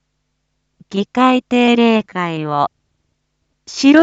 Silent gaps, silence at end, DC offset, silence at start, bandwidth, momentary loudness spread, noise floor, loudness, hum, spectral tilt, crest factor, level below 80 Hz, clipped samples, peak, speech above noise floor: none; 0 s; under 0.1%; 0.9 s; 8 kHz; 11 LU; -69 dBFS; -15 LUFS; none; -5 dB/octave; 16 dB; -60 dBFS; under 0.1%; 0 dBFS; 56 dB